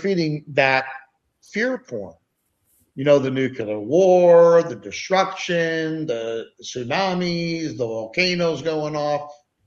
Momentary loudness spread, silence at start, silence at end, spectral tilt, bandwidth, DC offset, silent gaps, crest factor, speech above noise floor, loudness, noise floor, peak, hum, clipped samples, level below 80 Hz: 16 LU; 0 s; 0.35 s; -5.5 dB/octave; 7.2 kHz; under 0.1%; none; 18 dB; 50 dB; -20 LUFS; -70 dBFS; -2 dBFS; none; under 0.1%; -62 dBFS